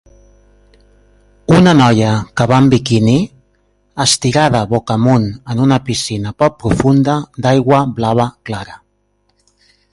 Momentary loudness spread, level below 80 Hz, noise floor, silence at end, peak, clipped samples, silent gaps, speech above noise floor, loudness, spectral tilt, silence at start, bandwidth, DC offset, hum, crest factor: 10 LU; -40 dBFS; -61 dBFS; 1.15 s; 0 dBFS; under 0.1%; none; 49 dB; -13 LUFS; -5.5 dB/octave; 1.5 s; 11.5 kHz; under 0.1%; 50 Hz at -40 dBFS; 14 dB